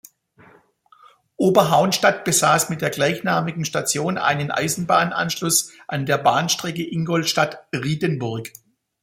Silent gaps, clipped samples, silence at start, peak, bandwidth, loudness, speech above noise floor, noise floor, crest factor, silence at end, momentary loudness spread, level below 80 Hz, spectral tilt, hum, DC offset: none; under 0.1%; 1.4 s; -2 dBFS; 16.5 kHz; -20 LUFS; 34 dB; -54 dBFS; 20 dB; 0.55 s; 10 LU; -60 dBFS; -3.5 dB/octave; none; under 0.1%